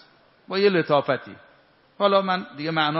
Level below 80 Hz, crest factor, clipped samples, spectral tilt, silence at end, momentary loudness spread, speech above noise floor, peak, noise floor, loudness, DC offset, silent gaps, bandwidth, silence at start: -72 dBFS; 20 dB; under 0.1%; -3 dB/octave; 0 s; 8 LU; 35 dB; -4 dBFS; -57 dBFS; -23 LUFS; under 0.1%; none; 5.8 kHz; 0.5 s